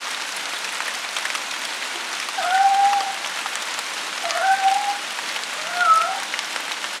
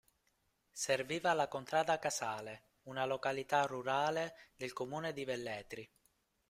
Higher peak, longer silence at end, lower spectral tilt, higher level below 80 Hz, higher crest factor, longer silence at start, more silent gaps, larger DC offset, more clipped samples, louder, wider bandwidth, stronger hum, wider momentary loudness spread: first, -2 dBFS vs -18 dBFS; second, 0 s vs 0.65 s; second, 1.5 dB/octave vs -3.5 dB/octave; second, under -90 dBFS vs -76 dBFS; about the same, 22 dB vs 20 dB; second, 0 s vs 0.75 s; neither; neither; neither; first, -22 LUFS vs -38 LUFS; about the same, 16.5 kHz vs 16 kHz; neither; second, 9 LU vs 12 LU